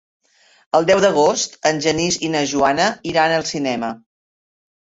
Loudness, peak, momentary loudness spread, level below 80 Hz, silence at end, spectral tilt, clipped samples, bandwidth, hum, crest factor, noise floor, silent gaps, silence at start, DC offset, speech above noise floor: -18 LUFS; 0 dBFS; 8 LU; -54 dBFS; 0.9 s; -3.5 dB/octave; under 0.1%; 8.2 kHz; none; 18 dB; under -90 dBFS; none; 0.75 s; under 0.1%; over 73 dB